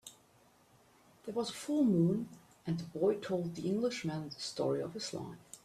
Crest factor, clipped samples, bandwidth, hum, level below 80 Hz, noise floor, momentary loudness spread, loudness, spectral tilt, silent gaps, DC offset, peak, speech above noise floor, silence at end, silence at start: 16 dB; under 0.1%; 14 kHz; none; -72 dBFS; -66 dBFS; 15 LU; -35 LUFS; -6 dB/octave; none; under 0.1%; -20 dBFS; 32 dB; 0.1 s; 0.05 s